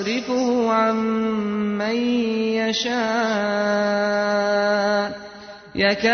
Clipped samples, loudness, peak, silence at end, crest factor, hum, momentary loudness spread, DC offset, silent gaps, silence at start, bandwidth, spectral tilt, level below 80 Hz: under 0.1%; -21 LUFS; -6 dBFS; 0 s; 14 dB; none; 4 LU; under 0.1%; none; 0 s; 6.6 kHz; -4.5 dB/octave; -58 dBFS